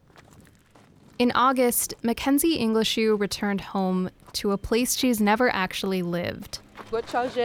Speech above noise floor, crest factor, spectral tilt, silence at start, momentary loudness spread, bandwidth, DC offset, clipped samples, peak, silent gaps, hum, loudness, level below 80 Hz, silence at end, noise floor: 31 dB; 14 dB; -4 dB/octave; 1.2 s; 10 LU; 20 kHz; under 0.1%; under 0.1%; -10 dBFS; none; none; -24 LUFS; -52 dBFS; 0 s; -55 dBFS